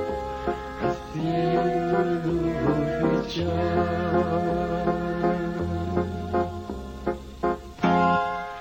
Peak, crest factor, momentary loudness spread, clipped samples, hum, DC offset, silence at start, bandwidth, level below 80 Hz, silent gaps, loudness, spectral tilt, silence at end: -8 dBFS; 18 dB; 7 LU; under 0.1%; none; under 0.1%; 0 s; 15.5 kHz; -42 dBFS; none; -26 LUFS; -7.5 dB/octave; 0 s